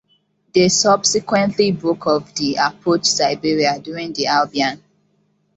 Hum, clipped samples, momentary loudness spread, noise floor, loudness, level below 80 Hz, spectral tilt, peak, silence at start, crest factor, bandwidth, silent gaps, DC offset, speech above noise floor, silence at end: none; under 0.1%; 8 LU; -63 dBFS; -17 LUFS; -58 dBFS; -3 dB/octave; -2 dBFS; 0.55 s; 16 dB; 8.2 kHz; none; under 0.1%; 46 dB; 0.8 s